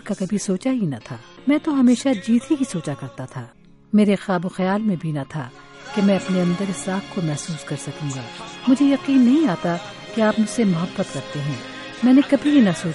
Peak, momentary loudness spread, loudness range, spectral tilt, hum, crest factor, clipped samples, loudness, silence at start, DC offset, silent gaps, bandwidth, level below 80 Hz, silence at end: -4 dBFS; 15 LU; 4 LU; -6 dB/octave; none; 16 dB; under 0.1%; -20 LUFS; 0.05 s; under 0.1%; none; 11.5 kHz; -58 dBFS; 0 s